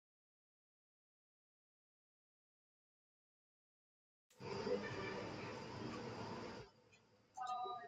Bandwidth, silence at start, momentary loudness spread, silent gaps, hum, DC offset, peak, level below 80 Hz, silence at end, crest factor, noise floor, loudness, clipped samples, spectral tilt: 10 kHz; 4.3 s; 13 LU; none; none; under 0.1%; -30 dBFS; -76 dBFS; 0 s; 22 dB; -72 dBFS; -48 LUFS; under 0.1%; -5.5 dB/octave